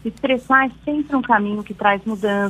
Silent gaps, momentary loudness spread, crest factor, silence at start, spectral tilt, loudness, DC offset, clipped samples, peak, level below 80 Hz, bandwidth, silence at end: none; 6 LU; 18 dB; 0.05 s; -6 dB/octave; -19 LUFS; under 0.1%; under 0.1%; 0 dBFS; -50 dBFS; 12.5 kHz; 0 s